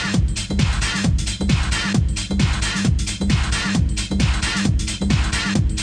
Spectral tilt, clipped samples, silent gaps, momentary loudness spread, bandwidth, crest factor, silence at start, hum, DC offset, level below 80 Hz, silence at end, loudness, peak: -4.5 dB/octave; under 0.1%; none; 2 LU; 10 kHz; 14 dB; 0 s; none; under 0.1%; -24 dBFS; 0 s; -20 LUFS; -6 dBFS